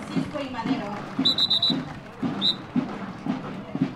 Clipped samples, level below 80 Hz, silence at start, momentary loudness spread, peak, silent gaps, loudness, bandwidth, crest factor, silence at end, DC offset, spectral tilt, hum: under 0.1%; -58 dBFS; 0 s; 13 LU; -10 dBFS; none; -25 LUFS; 12.5 kHz; 16 dB; 0 s; under 0.1%; -5 dB/octave; none